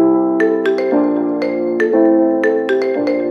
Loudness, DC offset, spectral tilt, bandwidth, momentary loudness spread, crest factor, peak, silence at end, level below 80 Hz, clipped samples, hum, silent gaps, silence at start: -15 LUFS; under 0.1%; -7 dB/octave; 6.6 kHz; 5 LU; 12 dB; -2 dBFS; 0 s; -72 dBFS; under 0.1%; none; none; 0 s